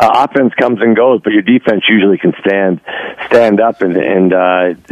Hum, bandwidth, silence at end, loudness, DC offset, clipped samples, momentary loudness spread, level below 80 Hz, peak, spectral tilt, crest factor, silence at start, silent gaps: none; 13 kHz; 0.15 s; -10 LUFS; under 0.1%; 0.3%; 5 LU; -52 dBFS; 0 dBFS; -7 dB/octave; 10 dB; 0 s; none